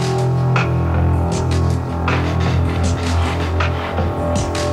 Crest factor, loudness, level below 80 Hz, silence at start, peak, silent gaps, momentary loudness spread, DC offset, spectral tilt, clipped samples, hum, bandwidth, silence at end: 14 dB; -18 LUFS; -26 dBFS; 0 s; -2 dBFS; none; 3 LU; under 0.1%; -6.5 dB/octave; under 0.1%; none; 11.5 kHz; 0 s